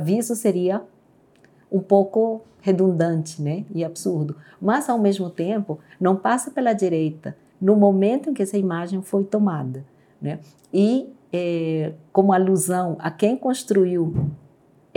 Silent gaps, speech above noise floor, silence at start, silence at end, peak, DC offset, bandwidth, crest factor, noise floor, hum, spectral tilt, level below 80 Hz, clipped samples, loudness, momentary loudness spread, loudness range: none; 35 dB; 0 s; 0.6 s; -2 dBFS; under 0.1%; 17.5 kHz; 20 dB; -55 dBFS; none; -6.5 dB/octave; -60 dBFS; under 0.1%; -22 LUFS; 11 LU; 3 LU